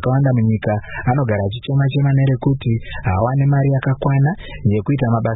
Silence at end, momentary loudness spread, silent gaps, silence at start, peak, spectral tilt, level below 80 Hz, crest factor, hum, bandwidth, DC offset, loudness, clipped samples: 0 s; 6 LU; none; 0 s; -4 dBFS; -13.5 dB/octave; -38 dBFS; 12 dB; none; 4 kHz; under 0.1%; -17 LUFS; under 0.1%